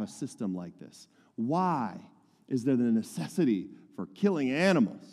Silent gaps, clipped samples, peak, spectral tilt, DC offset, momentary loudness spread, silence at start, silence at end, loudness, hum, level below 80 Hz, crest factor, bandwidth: none; under 0.1%; -14 dBFS; -6.5 dB/octave; under 0.1%; 19 LU; 0 s; 0 s; -30 LUFS; none; -76 dBFS; 18 dB; 13.5 kHz